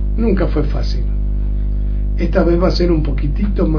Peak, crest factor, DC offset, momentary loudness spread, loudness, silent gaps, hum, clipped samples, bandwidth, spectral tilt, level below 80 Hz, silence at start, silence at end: -2 dBFS; 14 dB; under 0.1%; 6 LU; -17 LUFS; none; 50 Hz at -15 dBFS; under 0.1%; 5.4 kHz; -8.5 dB/octave; -16 dBFS; 0 s; 0 s